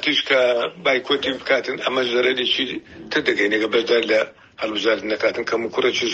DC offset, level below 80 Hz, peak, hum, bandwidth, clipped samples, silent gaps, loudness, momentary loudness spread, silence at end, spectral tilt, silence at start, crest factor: under 0.1%; -60 dBFS; -2 dBFS; none; 8.2 kHz; under 0.1%; none; -20 LUFS; 7 LU; 0 s; -3 dB/octave; 0 s; 18 dB